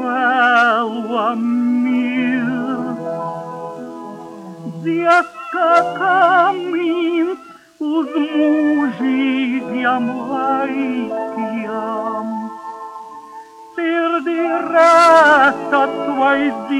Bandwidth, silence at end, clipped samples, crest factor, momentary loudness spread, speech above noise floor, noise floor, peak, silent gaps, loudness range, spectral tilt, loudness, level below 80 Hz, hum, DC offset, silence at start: 12 kHz; 0 s; under 0.1%; 14 dB; 18 LU; 22 dB; -37 dBFS; -2 dBFS; none; 8 LU; -5 dB/octave; -16 LUFS; -64 dBFS; none; under 0.1%; 0 s